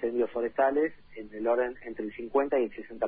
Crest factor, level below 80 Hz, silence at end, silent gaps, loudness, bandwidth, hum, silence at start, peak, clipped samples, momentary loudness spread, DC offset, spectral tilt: 16 dB; -64 dBFS; 0 s; none; -30 LUFS; 4.6 kHz; none; 0 s; -14 dBFS; under 0.1%; 11 LU; under 0.1%; -9 dB/octave